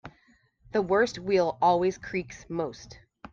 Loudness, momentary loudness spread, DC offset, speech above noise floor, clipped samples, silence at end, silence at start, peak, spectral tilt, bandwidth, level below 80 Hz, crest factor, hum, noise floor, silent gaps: -27 LUFS; 12 LU; under 0.1%; 37 dB; under 0.1%; 0.05 s; 0.05 s; -12 dBFS; -5.5 dB/octave; 7.6 kHz; -58 dBFS; 18 dB; none; -64 dBFS; none